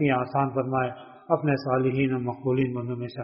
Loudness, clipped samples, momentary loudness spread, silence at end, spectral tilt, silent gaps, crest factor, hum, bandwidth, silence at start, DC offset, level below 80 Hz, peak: -26 LUFS; under 0.1%; 8 LU; 0 s; -7 dB/octave; none; 18 dB; none; 5.6 kHz; 0 s; under 0.1%; -60 dBFS; -6 dBFS